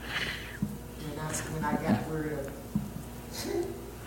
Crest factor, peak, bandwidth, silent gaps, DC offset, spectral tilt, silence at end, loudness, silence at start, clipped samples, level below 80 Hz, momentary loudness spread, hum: 20 dB; -14 dBFS; 17 kHz; none; under 0.1%; -5 dB/octave; 0 s; -34 LUFS; 0 s; under 0.1%; -48 dBFS; 10 LU; none